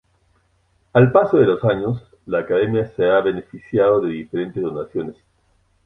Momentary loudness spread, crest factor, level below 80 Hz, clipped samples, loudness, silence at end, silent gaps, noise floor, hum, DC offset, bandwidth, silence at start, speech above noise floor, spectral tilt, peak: 13 LU; 18 dB; -52 dBFS; under 0.1%; -19 LUFS; 0.75 s; none; -62 dBFS; none; under 0.1%; 4 kHz; 0.95 s; 44 dB; -9.5 dB/octave; -2 dBFS